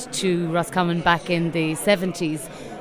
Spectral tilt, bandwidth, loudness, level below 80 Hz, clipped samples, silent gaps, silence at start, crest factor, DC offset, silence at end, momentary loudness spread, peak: -5 dB/octave; 16 kHz; -22 LUFS; -52 dBFS; under 0.1%; none; 0 s; 18 dB; under 0.1%; 0 s; 7 LU; -4 dBFS